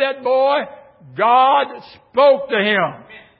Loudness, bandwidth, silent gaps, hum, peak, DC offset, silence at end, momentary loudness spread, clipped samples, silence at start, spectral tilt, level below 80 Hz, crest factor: -16 LUFS; 5.6 kHz; none; none; -4 dBFS; under 0.1%; 0.2 s; 12 LU; under 0.1%; 0 s; -9.5 dB/octave; -66 dBFS; 14 dB